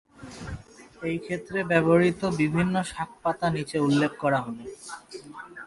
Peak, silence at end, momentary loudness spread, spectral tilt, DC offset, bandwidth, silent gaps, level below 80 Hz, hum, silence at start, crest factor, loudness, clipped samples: -6 dBFS; 0 s; 20 LU; -6.5 dB/octave; under 0.1%; 11.5 kHz; none; -54 dBFS; none; 0.2 s; 20 dB; -25 LUFS; under 0.1%